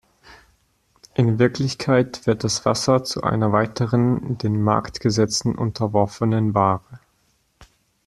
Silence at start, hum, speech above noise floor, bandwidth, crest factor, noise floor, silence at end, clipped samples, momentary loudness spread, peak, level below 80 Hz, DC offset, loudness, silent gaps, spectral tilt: 0.3 s; none; 45 dB; 12.5 kHz; 18 dB; -65 dBFS; 0.4 s; under 0.1%; 5 LU; -2 dBFS; -52 dBFS; under 0.1%; -21 LUFS; none; -6 dB/octave